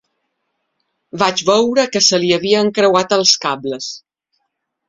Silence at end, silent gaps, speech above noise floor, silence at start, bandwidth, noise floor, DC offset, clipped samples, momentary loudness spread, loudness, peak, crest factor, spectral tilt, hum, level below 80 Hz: 0.9 s; none; 58 dB; 1.15 s; 7.8 kHz; -73 dBFS; under 0.1%; under 0.1%; 13 LU; -14 LUFS; 0 dBFS; 16 dB; -2.5 dB/octave; none; -60 dBFS